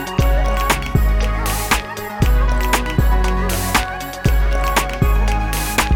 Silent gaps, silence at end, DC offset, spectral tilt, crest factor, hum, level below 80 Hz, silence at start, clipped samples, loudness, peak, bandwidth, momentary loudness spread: none; 0 s; under 0.1%; -4.5 dB/octave; 12 dB; none; -18 dBFS; 0 s; under 0.1%; -18 LUFS; -4 dBFS; 17.5 kHz; 3 LU